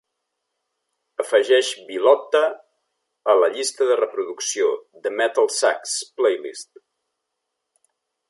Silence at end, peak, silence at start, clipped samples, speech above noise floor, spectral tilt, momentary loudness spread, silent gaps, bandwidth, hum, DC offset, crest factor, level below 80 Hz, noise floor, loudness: 1.65 s; -2 dBFS; 1.2 s; under 0.1%; 59 dB; 0 dB/octave; 11 LU; none; 11.5 kHz; none; under 0.1%; 20 dB; -82 dBFS; -79 dBFS; -20 LUFS